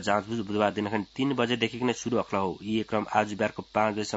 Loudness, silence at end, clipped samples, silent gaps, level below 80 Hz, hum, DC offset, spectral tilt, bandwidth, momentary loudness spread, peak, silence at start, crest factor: -28 LUFS; 0 s; under 0.1%; none; -64 dBFS; none; under 0.1%; -5 dB/octave; 8 kHz; 4 LU; -8 dBFS; 0 s; 20 dB